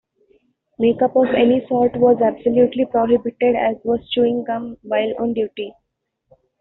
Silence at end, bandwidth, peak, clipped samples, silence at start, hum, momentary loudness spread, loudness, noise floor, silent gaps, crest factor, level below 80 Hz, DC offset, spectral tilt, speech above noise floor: 0.9 s; 4.1 kHz; -4 dBFS; under 0.1%; 0.8 s; none; 8 LU; -18 LUFS; -75 dBFS; none; 14 dB; -54 dBFS; under 0.1%; -4.5 dB/octave; 58 dB